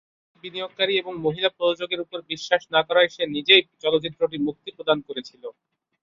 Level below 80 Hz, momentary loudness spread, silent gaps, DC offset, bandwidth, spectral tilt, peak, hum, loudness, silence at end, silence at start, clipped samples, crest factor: -66 dBFS; 18 LU; none; under 0.1%; 7.4 kHz; -4 dB/octave; -2 dBFS; none; -22 LUFS; 0.5 s; 0.45 s; under 0.1%; 22 dB